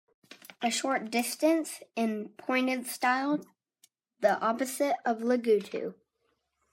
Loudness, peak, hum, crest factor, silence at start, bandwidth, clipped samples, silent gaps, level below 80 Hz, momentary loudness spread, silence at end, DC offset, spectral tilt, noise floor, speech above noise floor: -30 LUFS; -12 dBFS; none; 18 dB; 0.3 s; 16 kHz; under 0.1%; none; -86 dBFS; 10 LU; 0.8 s; under 0.1%; -3.5 dB/octave; -77 dBFS; 48 dB